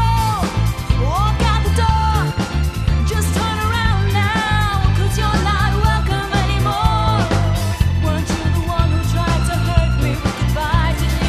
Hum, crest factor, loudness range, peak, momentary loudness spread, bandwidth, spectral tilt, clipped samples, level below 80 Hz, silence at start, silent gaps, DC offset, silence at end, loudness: none; 16 dB; 1 LU; 0 dBFS; 3 LU; 14 kHz; -5.5 dB/octave; under 0.1%; -22 dBFS; 0 s; none; under 0.1%; 0 s; -17 LUFS